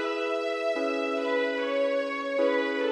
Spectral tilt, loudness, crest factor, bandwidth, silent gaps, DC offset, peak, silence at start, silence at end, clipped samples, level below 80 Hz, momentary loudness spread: -2.5 dB/octave; -28 LUFS; 12 dB; 11 kHz; none; under 0.1%; -14 dBFS; 0 s; 0 s; under 0.1%; -78 dBFS; 3 LU